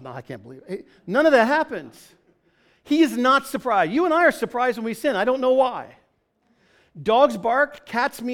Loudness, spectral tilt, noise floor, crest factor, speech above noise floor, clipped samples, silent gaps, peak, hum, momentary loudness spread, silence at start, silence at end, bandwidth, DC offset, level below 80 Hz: -20 LUFS; -4.5 dB/octave; -67 dBFS; 18 dB; 46 dB; under 0.1%; none; -4 dBFS; none; 18 LU; 0 s; 0 s; 18 kHz; under 0.1%; -62 dBFS